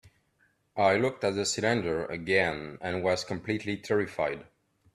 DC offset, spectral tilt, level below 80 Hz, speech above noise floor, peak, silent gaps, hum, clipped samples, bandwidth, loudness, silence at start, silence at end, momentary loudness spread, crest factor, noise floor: under 0.1%; -4.5 dB/octave; -62 dBFS; 41 dB; -10 dBFS; none; none; under 0.1%; 13 kHz; -29 LUFS; 0.75 s; 0.5 s; 7 LU; 20 dB; -70 dBFS